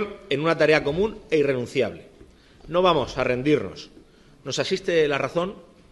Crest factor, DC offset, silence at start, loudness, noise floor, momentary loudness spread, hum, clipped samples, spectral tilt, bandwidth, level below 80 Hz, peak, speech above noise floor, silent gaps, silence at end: 20 dB; under 0.1%; 0 s; -23 LUFS; -51 dBFS; 11 LU; none; under 0.1%; -5 dB/octave; 12 kHz; -50 dBFS; -4 dBFS; 28 dB; none; 0.3 s